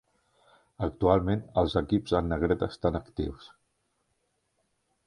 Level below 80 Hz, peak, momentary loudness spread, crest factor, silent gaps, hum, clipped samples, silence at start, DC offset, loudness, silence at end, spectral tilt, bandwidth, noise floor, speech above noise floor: -44 dBFS; -8 dBFS; 10 LU; 22 dB; none; none; under 0.1%; 0.8 s; under 0.1%; -28 LUFS; 1.6 s; -8 dB/octave; 11 kHz; -76 dBFS; 48 dB